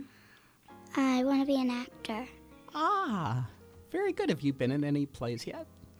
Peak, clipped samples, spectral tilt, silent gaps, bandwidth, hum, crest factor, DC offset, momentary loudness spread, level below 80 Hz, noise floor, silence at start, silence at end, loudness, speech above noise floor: -18 dBFS; under 0.1%; -6.5 dB/octave; none; over 20 kHz; none; 16 dB; under 0.1%; 14 LU; -64 dBFS; -60 dBFS; 0 s; 0.15 s; -32 LUFS; 29 dB